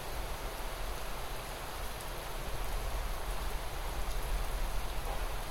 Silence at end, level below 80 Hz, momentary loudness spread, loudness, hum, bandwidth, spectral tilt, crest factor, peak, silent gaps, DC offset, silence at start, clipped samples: 0 s; -38 dBFS; 3 LU; -40 LUFS; none; 16 kHz; -3.5 dB/octave; 14 dB; -22 dBFS; none; under 0.1%; 0 s; under 0.1%